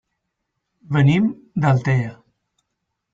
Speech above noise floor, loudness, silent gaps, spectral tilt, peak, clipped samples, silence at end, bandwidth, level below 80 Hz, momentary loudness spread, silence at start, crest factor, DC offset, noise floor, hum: 60 dB; -19 LUFS; none; -8 dB/octave; -4 dBFS; under 0.1%; 1 s; 7.6 kHz; -54 dBFS; 7 LU; 0.9 s; 16 dB; under 0.1%; -77 dBFS; none